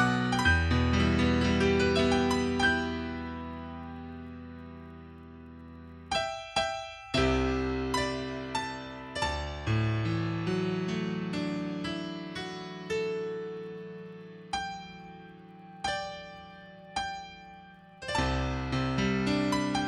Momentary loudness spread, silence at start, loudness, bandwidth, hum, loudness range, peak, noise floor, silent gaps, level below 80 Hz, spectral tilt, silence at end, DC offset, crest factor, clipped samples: 22 LU; 0 s; -30 LUFS; 12.5 kHz; none; 11 LU; -12 dBFS; -51 dBFS; none; -44 dBFS; -5.5 dB/octave; 0 s; under 0.1%; 20 dB; under 0.1%